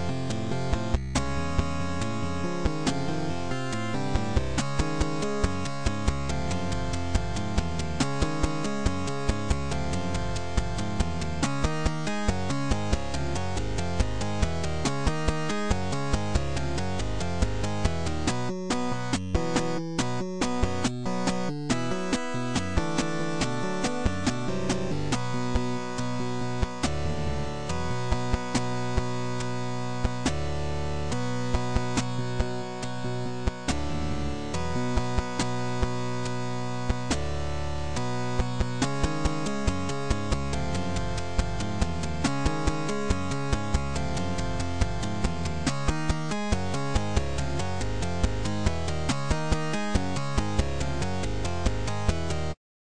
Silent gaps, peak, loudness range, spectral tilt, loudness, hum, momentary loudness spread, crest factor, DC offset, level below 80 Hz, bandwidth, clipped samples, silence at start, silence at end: none; -10 dBFS; 1 LU; -5.5 dB/octave; -30 LUFS; none; 3 LU; 18 dB; 3%; -34 dBFS; 10.5 kHz; under 0.1%; 0 s; 0.3 s